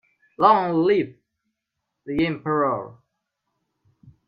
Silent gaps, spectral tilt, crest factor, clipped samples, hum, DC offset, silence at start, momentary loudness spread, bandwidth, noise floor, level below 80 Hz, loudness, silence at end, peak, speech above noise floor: none; -9 dB/octave; 24 dB; under 0.1%; none; under 0.1%; 0.4 s; 13 LU; 5.4 kHz; -81 dBFS; -60 dBFS; -21 LUFS; 0.15 s; -2 dBFS; 60 dB